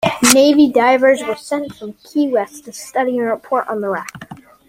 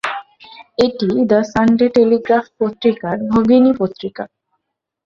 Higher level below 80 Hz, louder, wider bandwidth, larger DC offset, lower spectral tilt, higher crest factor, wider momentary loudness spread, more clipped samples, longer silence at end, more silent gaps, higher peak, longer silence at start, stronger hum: second, -56 dBFS vs -48 dBFS; about the same, -15 LUFS vs -15 LUFS; first, 16 kHz vs 7.6 kHz; neither; second, -3 dB/octave vs -7 dB/octave; about the same, 16 dB vs 14 dB; first, 19 LU vs 15 LU; neither; second, 0.35 s vs 0.8 s; neither; about the same, 0 dBFS vs -2 dBFS; about the same, 0 s vs 0.05 s; neither